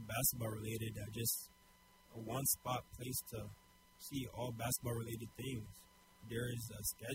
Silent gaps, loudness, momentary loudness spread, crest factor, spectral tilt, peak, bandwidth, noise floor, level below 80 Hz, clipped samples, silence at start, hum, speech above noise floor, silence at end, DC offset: none; -42 LUFS; 18 LU; 24 dB; -4 dB/octave; -20 dBFS; 16 kHz; -67 dBFS; -64 dBFS; under 0.1%; 0 s; none; 24 dB; 0 s; under 0.1%